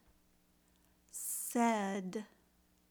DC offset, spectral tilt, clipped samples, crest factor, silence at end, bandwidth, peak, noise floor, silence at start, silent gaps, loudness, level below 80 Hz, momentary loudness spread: under 0.1%; -4 dB/octave; under 0.1%; 20 dB; 0.65 s; over 20 kHz; -20 dBFS; -71 dBFS; 1.15 s; none; -37 LUFS; -78 dBFS; 15 LU